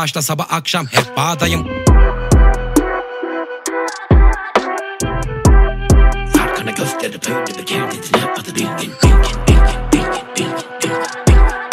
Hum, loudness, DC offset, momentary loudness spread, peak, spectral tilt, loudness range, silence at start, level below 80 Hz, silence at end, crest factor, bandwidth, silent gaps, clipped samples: none; -16 LUFS; under 0.1%; 8 LU; 0 dBFS; -5 dB/octave; 2 LU; 0 s; -16 dBFS; 0 s; 14 dB; 16 kHz; none; under 0.1%